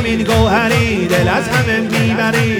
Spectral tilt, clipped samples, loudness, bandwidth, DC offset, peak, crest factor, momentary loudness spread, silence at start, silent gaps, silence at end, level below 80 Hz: -5.5 dB/octave; under 0.1%; -14 LUFS; 19.5 kHz; under 0.1%; 0 dBFS; 12 dB; 2 LU; 0 s; none; 0 s; -32 dBFS